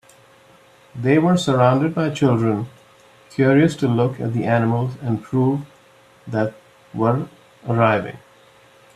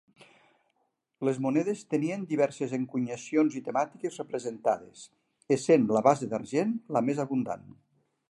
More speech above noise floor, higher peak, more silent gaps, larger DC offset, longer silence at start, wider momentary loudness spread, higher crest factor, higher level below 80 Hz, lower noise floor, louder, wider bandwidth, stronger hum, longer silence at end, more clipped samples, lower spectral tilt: second, 33 dB vs 49 dB; first, 0 dBFS vs -8 dBFS; neither; neither; second, 0.95 s vs 1.2 s; about the same, 13 LU vs 11 LU; about the same, 20 dB vs 22 dB; first, -58 dBFS vs -76 dBFS; second, -51 dBFS vs -77 dBFS; first, -19 LUFS vs -29 LUFS; about the same, 12 kHz vs 11.5 kHz; neither; about the same, 0.8 s vs 0.7 s; neither; about the same, -7.5 dB/octave vs -6.5 dB/octave